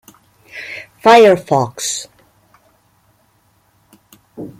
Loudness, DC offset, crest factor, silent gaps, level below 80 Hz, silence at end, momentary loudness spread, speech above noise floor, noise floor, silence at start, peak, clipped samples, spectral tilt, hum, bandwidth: -12 LUFS; under 0.1%; 16 dB; none; -60 dBFS; 0.1 s; 26 LU; 46 dB; -57 dBFS; 0.55 s; 0 dBFS; under 0.1%; -4 dB/octave; none; 16 kHz